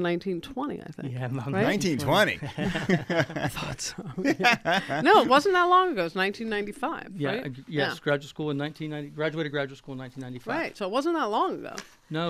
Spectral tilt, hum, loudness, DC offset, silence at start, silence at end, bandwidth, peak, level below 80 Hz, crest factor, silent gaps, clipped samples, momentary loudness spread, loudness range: -5 dB/octave; none; -26 LUFS; under 0.1%; 0 s; 0 s; 15.5 kHz; -6 dBFS; -56 dBFS; 20 dB; none; under 0.1%; 15 LU; 8 LU